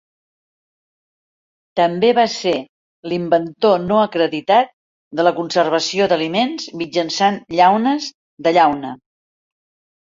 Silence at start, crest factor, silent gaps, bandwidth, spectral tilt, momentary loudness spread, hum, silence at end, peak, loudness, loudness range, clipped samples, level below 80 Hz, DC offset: 1.75 s; 18 dB; 2.69-3.03 s, 4.73-5.11 s, 8.14-8.37 s; 7.6 kHz; -4.5 dB/octave; 11 LU; none; 1.15 s; 0 dBFS; -17 LUFS; 2 LU; under 0.1%; -60 dBFS; under 0.1%